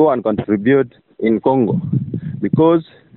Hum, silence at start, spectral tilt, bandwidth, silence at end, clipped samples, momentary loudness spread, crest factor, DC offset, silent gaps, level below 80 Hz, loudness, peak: none; 0 s; -8 dB/octave; 4.2 kHz; 0.35 s; under 0.1%; 8 LU; 12 dB; under 0.1%; none; -52 dBFS; -17 LUFS; -4 dBFS